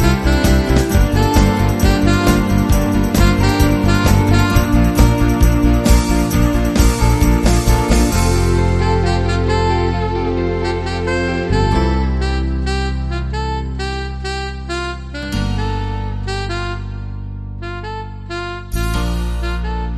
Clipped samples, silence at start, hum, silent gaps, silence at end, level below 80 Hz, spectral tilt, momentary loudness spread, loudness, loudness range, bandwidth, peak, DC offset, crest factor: under 0.1%; 0 s; none; none; 0 s; -18 dBFS; -6 dB/octave; 11 LU; -16 LUFS; 10 LU; 13.5 kHz; 0 dBFS; under 0.1%; 14 dB